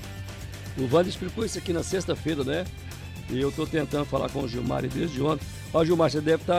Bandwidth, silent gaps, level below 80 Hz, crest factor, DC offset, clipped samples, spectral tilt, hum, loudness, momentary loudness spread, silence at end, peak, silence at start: 16 kHz; none; -44 dBFS; 16 dB; under 0.1%; under 0.1%; -6 dB/octave; none; -27 LUFS; 15 LU; 0 s; -10 dBFS; 0 s